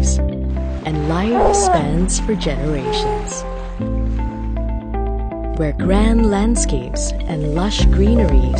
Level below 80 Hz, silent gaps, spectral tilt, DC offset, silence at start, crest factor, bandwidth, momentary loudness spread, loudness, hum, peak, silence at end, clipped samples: -20 dBFS; none; -5.5 dB/octave; under 0.1%; 0 s; 14 dB; 9.4 kHz; 10 LU; -18 LUFS; none; -2 dBFS; 0 s; under 0.1%